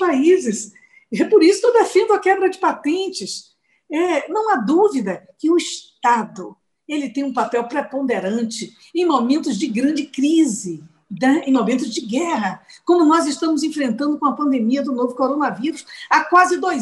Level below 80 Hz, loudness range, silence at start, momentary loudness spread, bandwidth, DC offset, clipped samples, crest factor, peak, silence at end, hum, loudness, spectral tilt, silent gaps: -68 dBFS; 4 LU; 0 s; 13 LU; 12 kHz; under 0.1%; under 0.1%; 14 dB; -4 dBFS; 0 s; none; -18 LUFS; -4.5 dB/octave; none